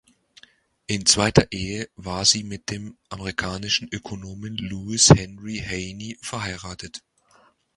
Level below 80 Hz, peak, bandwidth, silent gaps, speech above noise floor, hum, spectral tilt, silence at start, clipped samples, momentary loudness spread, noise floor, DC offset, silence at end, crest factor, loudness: -44 dBFS; 0 dBFS; 11.5 kHz; none; 35 dB; none; -3.5 dB/octave; 0.9 s; under 0.1%; 19 LU; -59 dBFS; under 0.1%; 0.8 s; 24 dB; -22 LUFS